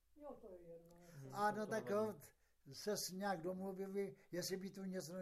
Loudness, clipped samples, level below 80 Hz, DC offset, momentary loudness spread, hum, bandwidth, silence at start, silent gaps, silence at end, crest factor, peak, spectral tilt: -45 LUFS; under 0.1%; -78 dBFS; under 0.1%; 17 LU; none; 15 kHz; 0.15 s; none; 0 s; 18 dB; -28 dBFS; -4.5 dB/octave